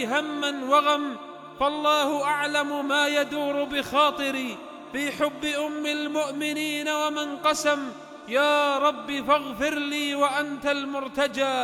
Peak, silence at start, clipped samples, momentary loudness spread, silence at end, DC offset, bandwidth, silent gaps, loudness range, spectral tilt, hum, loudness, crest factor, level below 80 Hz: -8 dBFS; 0 s; under 0.1%; 8 LU; 0 s; under 0.1%; 17.5 kHz; none; 2 LU; -2.5 dB/octave; none; -25 LUFS; 18 dB; -62 dBFS